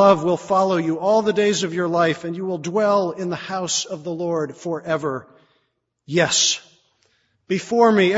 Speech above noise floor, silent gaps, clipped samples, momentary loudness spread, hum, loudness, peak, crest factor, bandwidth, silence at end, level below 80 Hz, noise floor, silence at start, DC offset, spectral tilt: 51 dB; none; under 0.1%; 11 LU; none; -20 LUFS; -2 dBFS; 18 dB; 8 kHz; 0 s; -64 dBFS; -71 dBFS; 0 s; under 0.1%; -3.5 dB/octave